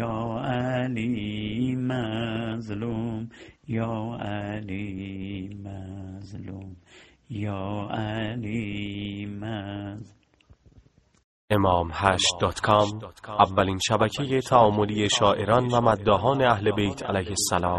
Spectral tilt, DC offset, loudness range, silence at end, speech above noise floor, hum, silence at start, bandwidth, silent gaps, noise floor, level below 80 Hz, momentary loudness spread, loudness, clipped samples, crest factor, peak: -5 dB/octave; under 0.1%; 13 LU; 0 s; 32 dB; none; 0 s; 11.5 kHz; 11.24-11.48 s; -58 dBFS; -52 dBFS; 17 LU; -25 LUFS; under 0.1%; 24 dB; -2 dBFS